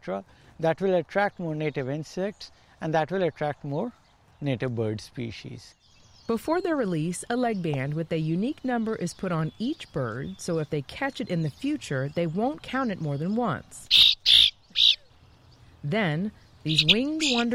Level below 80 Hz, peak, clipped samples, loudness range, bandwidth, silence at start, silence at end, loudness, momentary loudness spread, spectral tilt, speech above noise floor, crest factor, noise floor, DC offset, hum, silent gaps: -56 dBFS; -6 dBFS; under 0.1%; 10 LU; 16.5 kHz; 0.05 s; 0 s; -25 LUFS; 16 LU; -4.5 dB/octave; 28 dB; 20 dB; -55 dBFS; under 0.1%; none; none